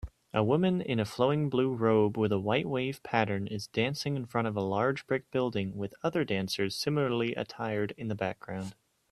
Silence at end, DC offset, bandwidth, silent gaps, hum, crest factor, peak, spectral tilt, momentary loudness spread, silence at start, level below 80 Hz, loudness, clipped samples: 0.4 s; under 0.1%; 14 kHz; none; none; 22 dB; -10 dBFS; -6.5 dB/octave; 8 LU; 0 s; -60 dBFS; -31 LUFS; under 0.1%